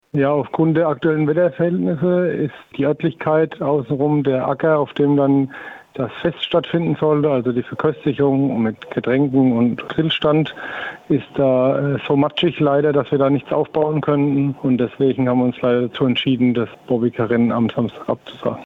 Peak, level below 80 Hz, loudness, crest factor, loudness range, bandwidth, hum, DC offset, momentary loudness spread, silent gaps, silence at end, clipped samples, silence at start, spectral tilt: -6 dBFS; -56 dBFS; -18 LUFS; 12 dB; 1 LU; 4.5 kHz; none; under 0.1%; 7 LU; none; 0 s; under 0.1%; 0.15 s; -9 dB/octave